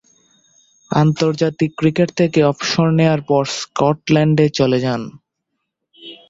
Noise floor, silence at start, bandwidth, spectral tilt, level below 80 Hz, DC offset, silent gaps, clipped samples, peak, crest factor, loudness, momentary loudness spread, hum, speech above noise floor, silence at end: -75 dBFS; 0.9 s; 7.8 kHz; -6.5 dB/octave; -52 dBFS; under 0.1%; none; under 0.1%; -2 dBFS; 16 dB; -16 LUFS; 7 LU; none; 60 dB; 0.15 s